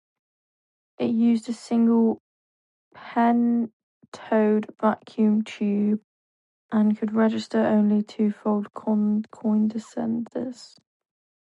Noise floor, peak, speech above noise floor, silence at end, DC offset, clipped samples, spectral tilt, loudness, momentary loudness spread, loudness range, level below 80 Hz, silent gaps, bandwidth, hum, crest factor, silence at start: under -90 dBFS; -8 dBFS; over 67 dB; 0.9 s; under 0.1%; under 0.1%; -7.5 dB/octave; -24 LUFS; 9 LU; 2 LU; -72 dBFS; 2.20-2.91 s, 3.73-4.01 s, 4.08-4.12 s, 6.04-6.69 s; 8.2 kHz; none; 16 dB; 1 s